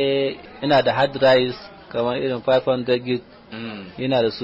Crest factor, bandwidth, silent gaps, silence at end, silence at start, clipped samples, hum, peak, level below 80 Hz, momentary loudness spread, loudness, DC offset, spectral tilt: 14 dB; 7.8 kHz; none; 0 s; 0 s; under 0.1%; none; -6 dBFS; -56 dBFS; 16 LU; -20 LUFS; under 0.1%; -3.5 dB/octave